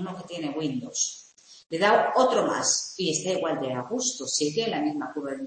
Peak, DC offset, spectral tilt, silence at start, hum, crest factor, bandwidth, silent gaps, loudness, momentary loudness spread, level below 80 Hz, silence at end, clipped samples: -8 dBFS; under 0.1%; -2.5 dB/octave; 0 s; none; 20 dB; 8.8 kHz; 1.66-1.70 s; -26 LUFS; 11 LU; -72 dBFS; 0 s; under 0.1%